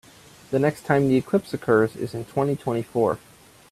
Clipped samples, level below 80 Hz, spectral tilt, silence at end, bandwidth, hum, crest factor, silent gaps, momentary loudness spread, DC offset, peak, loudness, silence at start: under 0.1%; -58 dBFS; -7.5 dB/octave; 0.55 s; 14.5 kHz; none; 20 dB; none; 8 LU; under 0.1%; -4 dBFS; -23 LUFS; 0.5 s